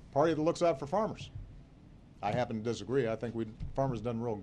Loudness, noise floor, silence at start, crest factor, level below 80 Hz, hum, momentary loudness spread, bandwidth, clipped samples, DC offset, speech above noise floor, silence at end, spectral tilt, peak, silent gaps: -33 LUFS; -55 dBFS; 0 s; 18 dB; -52 dBFS; none; 12 LU; 10.5 kHz; under 0.1%; under 0.1%; 23 dB; 0 s; -6.5 dB/octave; -16 dBFS; none